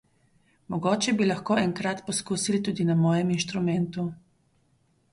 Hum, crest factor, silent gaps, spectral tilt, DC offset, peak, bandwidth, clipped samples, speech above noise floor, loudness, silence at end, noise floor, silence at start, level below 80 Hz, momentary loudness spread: none; 16 dB; none; -5 dB/octave; under 0.1%; -12 dBFS; 11.5 kHz; under 0.1%; 41 dB; -26 LUFS; 0.95 s; -67 dBFS; 0.7 s; -64 dBFS; 7 LU